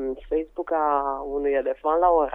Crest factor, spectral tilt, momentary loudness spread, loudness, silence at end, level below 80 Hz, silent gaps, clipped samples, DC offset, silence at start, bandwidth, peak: 16 dB; -8 dB/octave; 8 LU; -24 LUFS; 0 s; -46 dBFS; none; under 0.1%; under 0.1%; 0 s; 3.7 kHz; -8 dBFS